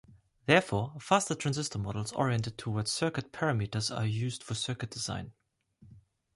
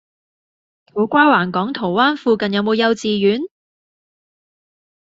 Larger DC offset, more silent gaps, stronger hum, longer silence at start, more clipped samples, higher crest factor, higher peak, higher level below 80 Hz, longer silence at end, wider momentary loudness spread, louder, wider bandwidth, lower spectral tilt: neither; neither; neither; second, 0.1 s vs 0.95 s; neither; first, 24 dB vs 18 dB; second, -10 dBFS vs -2 dBFS; about the same, -58 dBFS vs -62 dBFS; second, 0.35 s vs 1.7 s; about the same, 10 LU vs 9 LU; second, -32 LUFS vs -16 LUFS; first, 11.5 kHz vs 7.8 kHz; about the same, -4.5 dB/octave vs -5.5 dB/octave